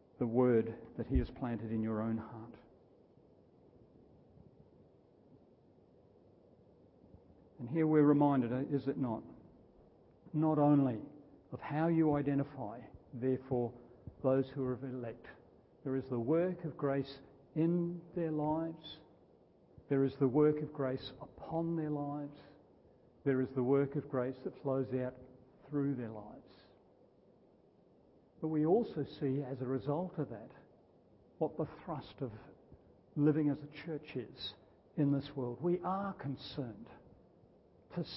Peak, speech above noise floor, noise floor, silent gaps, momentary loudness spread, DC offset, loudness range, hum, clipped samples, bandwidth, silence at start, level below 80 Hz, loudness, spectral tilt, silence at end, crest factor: -16 dBFS; 31 dB; -66 dBFS; none; 18 LU; under 0.1%; 7 LU; none; under 0.1%; 5.6 kHz; 0.2 s; -58 dBFS; -36 LUFS; -7.5 dB/octave; 0 s; 22 dB